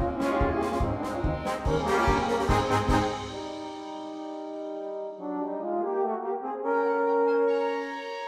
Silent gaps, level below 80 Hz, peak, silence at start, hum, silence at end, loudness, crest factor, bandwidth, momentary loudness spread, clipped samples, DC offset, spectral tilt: none; -38 dBFS; -10 dBFS; 0 s; none; 0 s; -28 LUFS; 18 dB; 15 kHz; 12 LU; under 0.1%; under 0.1%; -6 dB/octave